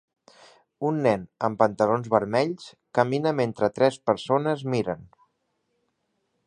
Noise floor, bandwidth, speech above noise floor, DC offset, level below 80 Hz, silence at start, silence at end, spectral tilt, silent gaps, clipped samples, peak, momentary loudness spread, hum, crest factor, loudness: -75 dBFS; 10 kHz; 51 dB; under 0.1%; -64 dBFS; 0.8 s; 1.45 s; -6.5 dB/octave; none; under 0.1%; -4 dBFS; 7 LU; none; 22 dB; -25 LUFS